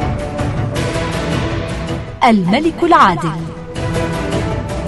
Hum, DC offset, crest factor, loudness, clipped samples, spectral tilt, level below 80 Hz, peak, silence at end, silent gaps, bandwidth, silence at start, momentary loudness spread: none; under 0.1%; 16 dB; -16 LUFS; under 0.1%; -6 dB/octave; -30 dBFS; 0 dBFS; 0 s; none; 12 kHz; 0 s; 12 LU